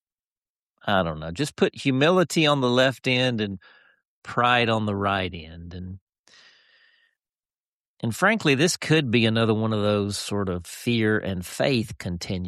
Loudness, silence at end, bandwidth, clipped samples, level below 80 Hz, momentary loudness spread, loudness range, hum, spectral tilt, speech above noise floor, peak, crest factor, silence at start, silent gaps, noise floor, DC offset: -23 LUFS; 0 s; 13.5 kHz; under 0.1%; -54 dBFS; 12 LU; 7 LU; none; -5 dB/octave; over 67 dB; -8 dBFS; 18 dB; 0.85 s; 4.05-4.22 s, 6.01-6.07 s, 6.19-6.24 s, 7.60-7.97 s; under -90 dBFS; under 0.1%